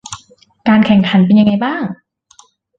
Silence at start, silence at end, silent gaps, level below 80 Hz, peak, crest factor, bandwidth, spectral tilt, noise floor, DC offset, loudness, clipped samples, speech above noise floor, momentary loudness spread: 0.1 s; 0.85 s; none; -50 dBFS; -2 dBFS; 12 dB; 8.8 kHz; -6.5 dB/octave; -48 dBFS; under 0.1%; -12 LUFS; under 0.1%; 38 dB; 21 LU